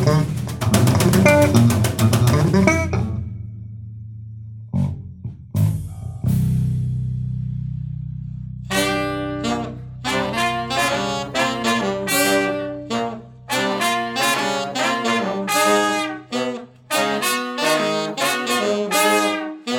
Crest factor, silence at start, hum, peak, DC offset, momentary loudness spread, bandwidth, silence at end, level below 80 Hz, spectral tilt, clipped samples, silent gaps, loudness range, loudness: 18 dB; 0 s; none; -2 dBFS; under 0.1%; 16 LU; 17.5 kHz; 0 s; -42 dBFS; -5 dB/octave; under 0.1%; none; 7 LU; -20 LUFS